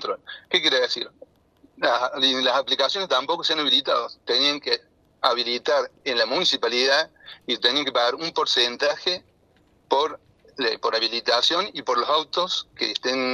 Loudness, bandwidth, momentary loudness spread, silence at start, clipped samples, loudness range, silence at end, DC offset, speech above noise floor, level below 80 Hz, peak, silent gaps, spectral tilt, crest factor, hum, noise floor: -22 LUFS; 12.5 kHz; 7 LU; 0 s; under 0.1%; 3 LU; 0 s; under 0.1%; 37 dB; -70 dBFS; -4 dBFS; none; -1.5 dB/octave; 20 dB; none; -60 dBFS